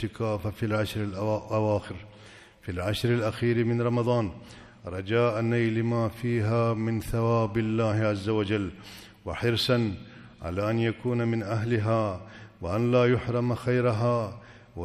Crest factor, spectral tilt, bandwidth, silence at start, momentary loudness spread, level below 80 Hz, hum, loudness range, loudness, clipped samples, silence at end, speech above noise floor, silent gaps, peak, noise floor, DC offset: 16 dB; -7 dB/octave; 14 kHz; 0 s; 15 LU; -52 dBFS; none; 2 LU; -27 LUFS; under 0.1%; 0 s; 24 dB; none; -10 dBFS; -51 dBFS; under 0.1%